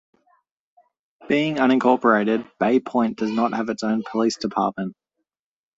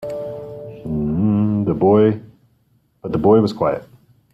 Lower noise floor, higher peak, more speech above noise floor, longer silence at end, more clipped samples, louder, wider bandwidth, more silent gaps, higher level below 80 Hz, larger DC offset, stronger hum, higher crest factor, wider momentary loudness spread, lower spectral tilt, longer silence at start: first, under -90 dBFS vs -60 dBFS; about the same, -4 dBFS vs -2 dBFS; first, over 69 dB vs 44 dB; first, 0.85 s vs 0.5 s; neither; second, -21 LUFS vs -18 LUFS; about the same, 8 kHz vs 7.6 kHz; neither; second, -64 dBFS vs -46 dBFS; neither; neither; about the same, 20 dB vs 16 dB; second, 7 LU vs 17 LU; second, -5.5 dB/octave vs -9.5 dB/octave; first, 1.2 s vs 0 s